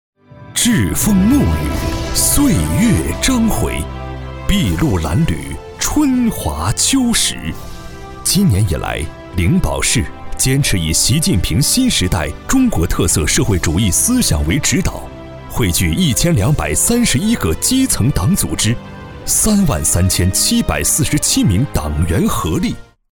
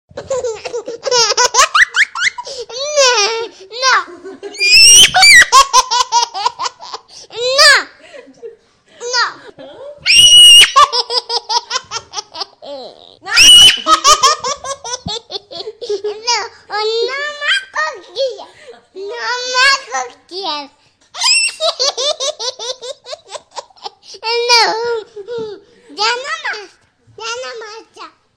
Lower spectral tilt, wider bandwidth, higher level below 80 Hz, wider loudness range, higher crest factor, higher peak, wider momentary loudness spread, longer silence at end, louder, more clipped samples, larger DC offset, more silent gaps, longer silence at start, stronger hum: first, -4 dB/octave vs 1.5 dB/octave; about the same, over 20 kHz vs over 20 kHz; first, -26 dBFS vs -46 dBFS; second, 3 LU vs 11 LU; about the same, 12 dB vs 14 dB; about the same, -2 dBFS vs 0 dBFS; second, 11 LU vs 25 LU; about the same, 0.3 s vs 0.3 s; second, -14 LUFS vs -9 LUFS; second, under 0.1% vs 0.1%; neither; neither; first, 0.35 s vs 0.15 s; neither